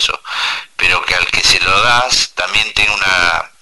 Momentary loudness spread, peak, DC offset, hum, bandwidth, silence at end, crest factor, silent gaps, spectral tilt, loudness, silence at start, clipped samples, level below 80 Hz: 7 LU; 0 dBFS; under 0.1%; none; 12 kHz; 0 s; 14 dB; none; -0.5 dB/octave; -12 LUFS; 0 s; under 0.1%; -36 dBFS